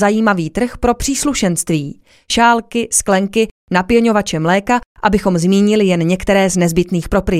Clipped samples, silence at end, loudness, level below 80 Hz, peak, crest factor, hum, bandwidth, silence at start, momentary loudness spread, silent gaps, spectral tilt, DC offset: under 0.1%; 0 s; -14 LUFS; -34 dBFS; 0 dBFS; 14 dB; none; 15 kHz; 0 s; 6 LU; 3.51-3.67 s, 4.86-4.95 s; -4.5 dB/octave; under 0.1%